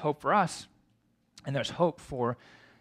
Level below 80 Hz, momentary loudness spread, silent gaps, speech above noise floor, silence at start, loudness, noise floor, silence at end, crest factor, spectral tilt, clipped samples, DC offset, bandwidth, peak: -64 dBFS; 16 LU; none; 40 dB; 0 s; -30 LUFS; -71 dBFS; 0.45 s; 20 dB; -5.5 dB/octave; under 0.1%; under 0.1%; 14.5 kHz; -12 dBFS